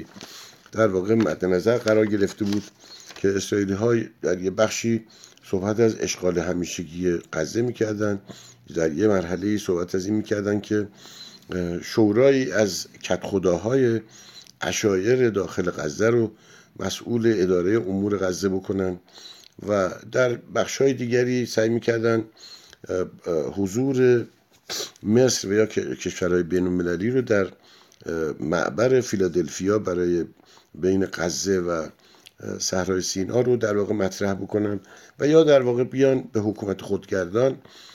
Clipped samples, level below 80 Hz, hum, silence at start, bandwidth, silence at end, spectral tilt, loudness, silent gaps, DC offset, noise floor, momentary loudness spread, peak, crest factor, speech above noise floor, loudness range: under 0.1%; -58 dBFS; none; 0 s; 16 kHz; 0.1 s; -5.5 dB/octave; -23 LUFS; none; under 0.1%; -44 dBFS; 12 LU; -4 dBFS; 18 dB; 22 dB; 3 LU